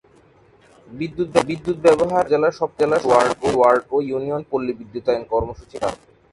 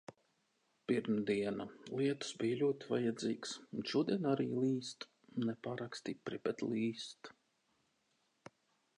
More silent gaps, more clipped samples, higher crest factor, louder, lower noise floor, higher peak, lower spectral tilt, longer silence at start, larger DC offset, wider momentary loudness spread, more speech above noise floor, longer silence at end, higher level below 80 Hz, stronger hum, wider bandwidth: neither; neither; about the same, 18 dB vs 18 dB; first, -20 LUFS vs -39 LUFS; second, -53 dBFS vs -80 dBFS; first, -2 dBFS vs -22 dBFS; about the same, -5.5 dB/octave vs -5.5 dB/octave; first, 0.9 s vs 0.1 s; neither; about the same, 11 LU vs 12 LU; second, 33 dB vs 42 dB; second, 0.35 s vs 1.7 s; first, -48 dBFS vs -82 dBFS; neither; about the same, 11.5 kHz vs 11 kHz